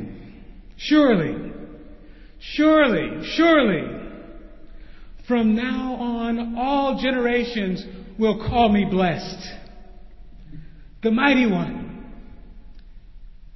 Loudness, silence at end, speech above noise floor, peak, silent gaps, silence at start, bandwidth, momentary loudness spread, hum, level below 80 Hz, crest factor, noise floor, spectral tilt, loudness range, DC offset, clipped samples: -21 LUFS; 0 s; 23 dB; -4 dBFS; none; 0 s; 6 kHz; 21 LU; none; -42 dBFS; 18 dB; -43 dBFS; -6.5 dB/octave; 4 LU; under 0.1%; under 0.1%